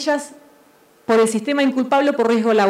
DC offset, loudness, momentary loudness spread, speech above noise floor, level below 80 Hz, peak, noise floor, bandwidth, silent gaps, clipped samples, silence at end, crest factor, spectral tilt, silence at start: under 0.1%; -18 LUFS; 10 LU; 35 dB; -72 dBFS; -4 dBFS; -52 dBFS; 15 kHz; none; under 0.1%; 0 s; 14 dB; -4.5 dB/octave; 0 s